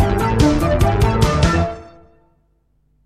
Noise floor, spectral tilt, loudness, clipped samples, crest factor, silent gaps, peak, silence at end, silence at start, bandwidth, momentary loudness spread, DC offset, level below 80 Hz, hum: -61 dBFS; -6.5 dB/octave; -16 LUFS; under 0.1%; 16 dB; none; 0 dBFS; 1.2 s; 0 s; 15.5 kHz; 6 LU; under 0.1%; -24 dBFS; none